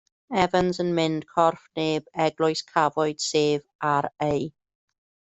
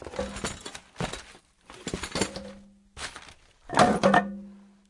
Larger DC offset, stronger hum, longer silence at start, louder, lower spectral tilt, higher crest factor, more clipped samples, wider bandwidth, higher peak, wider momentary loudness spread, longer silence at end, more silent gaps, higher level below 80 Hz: neither; neither; first, 0.3 s vs 0 s; about the same, -25 LUFS vs -27 LUFS; about the same, -5 dB/octave vs -4.5 dB/octave; second, 20 dB vs 26 dB; neither; second, 8.2 kHz vs 11.5 kHz; about the same, -6 dBFS vs -4 dBFS; second, 4 LU vs 20 LU; first, 0.75 s vs 0.3 s; first, 3.75-3.79 s vs none; second, -58 dBFS vs -50 dBFS